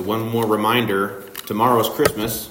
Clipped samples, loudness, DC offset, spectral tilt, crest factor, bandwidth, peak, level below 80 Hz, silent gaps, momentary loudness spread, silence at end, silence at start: under 0.1%; -19 LUFS; under 0.1%; -4.5 dB/octave; 18 dB; 16.5 kHz; -2 dBFS; -50 dBFS; none; 9 LU; 0 s; 0 s